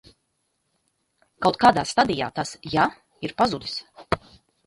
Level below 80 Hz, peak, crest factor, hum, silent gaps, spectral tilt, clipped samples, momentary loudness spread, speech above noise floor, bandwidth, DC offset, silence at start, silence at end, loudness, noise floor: -52 dBFS; -2 dBFS; 22 dB; none; none; -4.5 dB/octave; under 0.1%; 14 LU; 51 dB; 11.5 kHz; under 0.1%; 1.4 s; 0.5 s; -23 LUFS; -74 dBFS